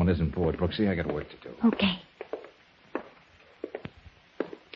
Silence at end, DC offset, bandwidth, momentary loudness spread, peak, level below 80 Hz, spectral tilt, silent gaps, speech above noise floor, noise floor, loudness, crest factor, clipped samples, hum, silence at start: 0.2 s; under 0.1%; 5.8 kHz; 16 LU; -12 dBFS; -46 dBFS; -9 dB/octave; none; 30 dB; -57 dBFS; -30 LUFS; 18 dB; under 0.1%; none; 0 s